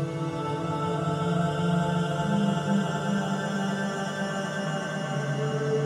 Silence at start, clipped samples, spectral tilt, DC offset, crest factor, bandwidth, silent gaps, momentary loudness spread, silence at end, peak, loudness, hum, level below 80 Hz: 0 s; under 0.1%; -6.5 dB/octave; under 0.1%; 12 dB; 12 kHz; none; 4 LU; 0 s; -14 dBFS; -28 LUFS; none; -58 dBFS